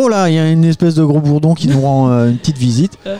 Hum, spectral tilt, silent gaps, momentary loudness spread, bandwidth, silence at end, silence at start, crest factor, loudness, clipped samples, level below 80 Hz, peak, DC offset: none; -7.5 dB/octave; none; 3 LU; 10.5 kHz; 0 s; 0 s; 8 dB; -12 LUFS; under 0.1%; -46 dBFS; -2 dBFS; under 0.1%